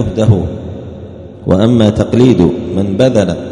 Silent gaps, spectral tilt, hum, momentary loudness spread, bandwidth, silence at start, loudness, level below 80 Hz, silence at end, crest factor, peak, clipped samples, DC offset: none; -8 dB/octave; none; 18 LU; 10.5 kHz; 0 s; -11 LUFS; -34 dBFS; 0 s; 12 dB; 0 dBFS; 0.5%; under 0.1%